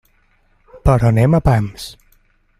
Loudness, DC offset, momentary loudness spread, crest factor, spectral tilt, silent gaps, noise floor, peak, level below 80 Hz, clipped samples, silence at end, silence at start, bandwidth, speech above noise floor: -15 LUFS; under 0.1%; 17 LU; 16 dB; -8 dB/octave; none; -57 dBFS; -2 dBFS; -30 dBFS; under 0.1%; 0.7 s; 0.75 s; 13 kHz; 43 dB